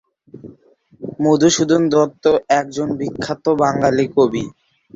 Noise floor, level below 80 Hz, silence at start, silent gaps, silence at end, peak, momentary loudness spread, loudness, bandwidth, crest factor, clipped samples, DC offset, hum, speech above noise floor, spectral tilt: -36 dBFS; -54 dBFS; 0.35 s; none; 0.45 s; -2 dBFS; 11 LU; -17 LUFS; 7.8 kHz; 16 dB; under 0.1%; under 0.1%; none; 20 dB; -5 dB/octave